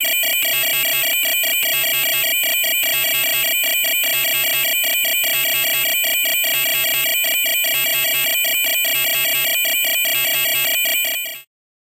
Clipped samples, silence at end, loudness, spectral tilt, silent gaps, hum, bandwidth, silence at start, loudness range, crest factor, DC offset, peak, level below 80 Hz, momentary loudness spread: under 0.1%; 0.55 s; -15 LUFS; 1.5 dB/octave; none; none; 17.5 kHz; 0 s; 0 LU; 10 dB; under 0.1%; -8 dBFS; -60 dBFS; 0 LU